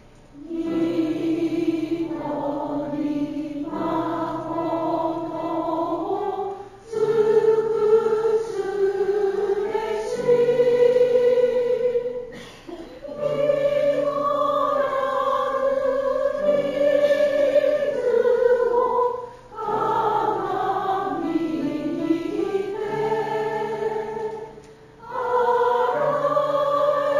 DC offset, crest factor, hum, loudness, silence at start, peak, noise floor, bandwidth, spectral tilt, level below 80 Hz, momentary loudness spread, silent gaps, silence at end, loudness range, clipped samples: under 0.1%; 14 dB; none; -22 LUFS; 0.35 s; -8 dBFS; -45 dBFS; 12.5 kHz; -6.5 dB/octave; -54 dBFS; 10 LU; none; 0 s; 6 LU; under 0.1%